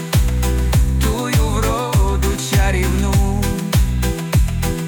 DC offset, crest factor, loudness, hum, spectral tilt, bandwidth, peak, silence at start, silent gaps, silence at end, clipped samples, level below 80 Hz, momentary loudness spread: under 0.1%; 10 dB; -18 LUFS; none; -5.5 dB/octave; 19.5 kHz; -6 dBFS; 0 s; none; 0 s; under 0.1%; -18 dBFS; 3 LU